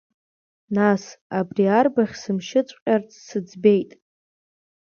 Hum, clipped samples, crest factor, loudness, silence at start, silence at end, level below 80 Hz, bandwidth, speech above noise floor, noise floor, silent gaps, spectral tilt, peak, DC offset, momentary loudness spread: none; under 0.1%; 20 dB; -22 LUFS; 0.7 s; 1 s; -66 dBFS; 7 kHz; over 69 dB; under -90 dBFS; 1.21-1.30 s, 2.82-2.86 s; -6.5 dB/octave; -4 dBFS; under 0.1%; 12 LU